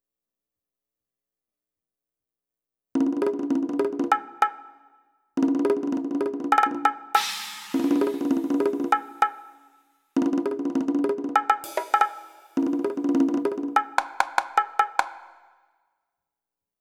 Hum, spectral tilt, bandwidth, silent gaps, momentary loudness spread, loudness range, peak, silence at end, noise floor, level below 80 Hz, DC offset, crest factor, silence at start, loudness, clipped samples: none; -4 dB/octave; 16.5 kHz; none; 6 LU; 4 LU; -2 dBFS; 1.55 s; -89 dBFS; -76 dBFS; under 0.1%; 24 dB; 2.95 s; -25 LUFS; under 0.1%